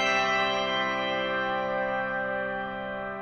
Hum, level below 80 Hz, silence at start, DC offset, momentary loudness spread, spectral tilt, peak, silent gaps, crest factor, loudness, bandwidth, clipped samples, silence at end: none; -58 dBFS; 0 s; under 0.1%; 9 LU; -3.5 dB/octave; -12 dBFS; none; 16 dB; -28 LUFS; 8.4 kHz; under 0.1%; 0 s